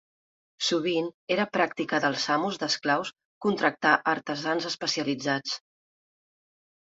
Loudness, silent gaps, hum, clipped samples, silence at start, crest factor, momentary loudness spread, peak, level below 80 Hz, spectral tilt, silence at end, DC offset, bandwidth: -27 LUFS; 1.14-1.27 s, 3.25-3.41 s; none; under 0.1%; 0.6 s; 22 dB; 6 LU; -6 dBFS; -74 dBFS; -3.5 dB/octave; 1.25 s; under 0.1%; 8 kHz